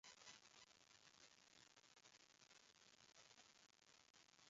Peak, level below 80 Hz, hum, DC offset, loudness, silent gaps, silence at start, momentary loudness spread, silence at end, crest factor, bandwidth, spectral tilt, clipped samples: -48 dBFS; under -90 dBFS; none; under 0.1%; -68 LUFS; 4.10-4.14 s; 0.05 s; 6 LU; 0 s; 24 dB; 7.6 kHz; 0 dB/octave; under 0.1%